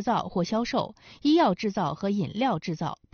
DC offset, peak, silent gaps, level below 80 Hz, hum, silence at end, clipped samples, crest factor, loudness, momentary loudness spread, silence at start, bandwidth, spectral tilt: under 0.1%; -10 dBFS; none; -58 dBFS; none; 0.2 s; under 0.1%; 16 dB; -27 LUFS; 9 LU; 0 s; 6.8 kHz; -5 dB/octave